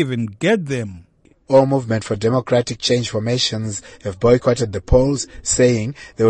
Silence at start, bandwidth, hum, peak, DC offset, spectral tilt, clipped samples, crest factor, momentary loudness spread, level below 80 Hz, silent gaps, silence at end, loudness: 0 s; 9 kHz; none; -2 dBFS; under 0.1%; -5 dB/octave; under 0.1%; 16 dB; 10 LU; -34 dBFS; none; 0 s; -18 LUFS